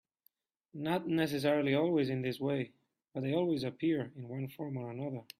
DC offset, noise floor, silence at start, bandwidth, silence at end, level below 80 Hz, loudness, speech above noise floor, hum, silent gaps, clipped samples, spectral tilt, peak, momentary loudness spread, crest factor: under 0.1%; -74 dBFS; 0.75 s; 15 kHz; 0.15 s; -74 dBFS; -34 LUFS; 41 dB; none; none; under 0.1%; -7 dB/octave; -16 dBFS; 12 LU; 18 dB